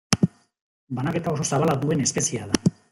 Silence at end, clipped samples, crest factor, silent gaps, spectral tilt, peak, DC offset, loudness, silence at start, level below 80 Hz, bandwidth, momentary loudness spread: 0.2 s; under 0.1%; 24 dB; 0.61-0.87 s; -4.5 dB/octave; 0 dBFS; under 0.1%; -24 LUFS; 0.1 s; -54 dBFS; 15.5 kHz; 5 LU